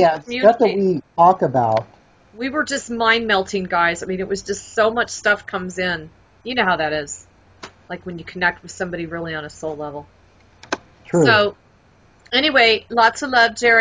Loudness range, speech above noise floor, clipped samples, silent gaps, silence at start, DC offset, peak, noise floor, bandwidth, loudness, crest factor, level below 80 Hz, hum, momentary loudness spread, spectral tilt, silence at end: 9 LU; 35 dB; under 0.1%; none; 0 s; under 0.1%; 0 dBFS; -53 dBFS; 7.8 kHz; -18 LUFS; 18 dB; -52 dBFS; none; 15 LU; -4 dB/octave; 0 s